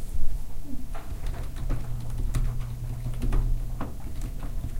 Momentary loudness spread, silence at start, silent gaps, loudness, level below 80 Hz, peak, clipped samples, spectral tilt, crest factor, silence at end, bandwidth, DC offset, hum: 9 LU; 0 s; none; -35 LUFS; -28 dBFS; -10 dBFS; under 0.1%; -6.5 dB/octave; 16 dB; 0 s; 15 kHz; under 0.1%; none